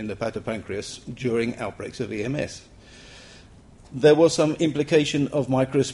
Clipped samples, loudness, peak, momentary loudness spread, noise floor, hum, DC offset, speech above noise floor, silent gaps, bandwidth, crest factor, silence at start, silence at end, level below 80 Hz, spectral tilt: under 0.1%; -23 LUFS; -6 dBFS; 16 LU; -49 dBFS; none; under 0.1%; 26 dB; none; 11.5 kHz; 18 dB; 0 s; 0 s; -54 dBFS; -5.5 dB/octave